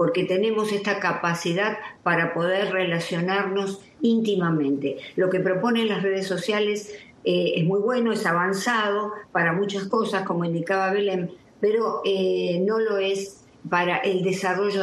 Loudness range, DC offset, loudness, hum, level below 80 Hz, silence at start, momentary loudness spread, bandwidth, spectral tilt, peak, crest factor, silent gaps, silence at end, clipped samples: 1 LU; under 0.1%; -24 LUFS; none; -70 dBFS; 0 s; 5 LU; 12.5 kHz; -5.5 dB/octave; -8 dBFS; 16 dB; none; 0 s; under 0.1%